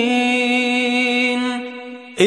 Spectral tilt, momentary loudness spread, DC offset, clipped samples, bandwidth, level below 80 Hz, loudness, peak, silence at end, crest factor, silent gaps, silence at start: -3.5 dB/octave; 15 LU; under 0.1%; under 0.1%; 11.5 kHz; -68 dBFS; -17 LUFS; -2 dBFS; 0 s; 16 dB; none; 0 s